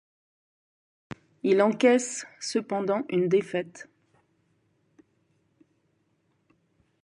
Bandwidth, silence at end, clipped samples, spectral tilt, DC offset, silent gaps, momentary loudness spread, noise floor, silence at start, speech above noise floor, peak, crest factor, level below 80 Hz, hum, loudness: 11.5 kHz; 3.2 s; under 0.1%; -5 dB/octave; under 0.1%; none; 25 LU; -71 dBFS; 1.45 s; 46 dB; -8 dBFS; 22 dB; -76 dBFS; none; -26 LUFS